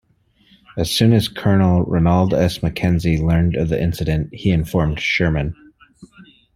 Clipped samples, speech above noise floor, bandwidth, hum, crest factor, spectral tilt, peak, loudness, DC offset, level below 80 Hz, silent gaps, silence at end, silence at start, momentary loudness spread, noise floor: under 0.1%; 41 dB; 15.5 kHz; none; 16 dB; -6.5 dB/octave; -2 dBFS; -18 LUFS; under 0.1%; -34 dBFS; none; 0.35 s; 0.75 s; 6 LU; -57 dBFS